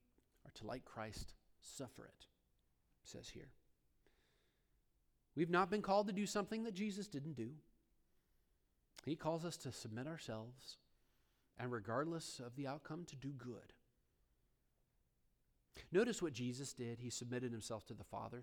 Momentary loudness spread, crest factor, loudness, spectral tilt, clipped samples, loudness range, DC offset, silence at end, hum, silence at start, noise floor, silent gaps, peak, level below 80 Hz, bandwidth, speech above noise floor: 21 LU; 24 dB; -45 LUFS; -5 dB/octave; under 0.1%; 15 LU; under 0.1%; 0 s; none; 0.45 s; -81 dBFS; none; -24 dBFS; -72 dBFS; 19.5 kHz; 36 dB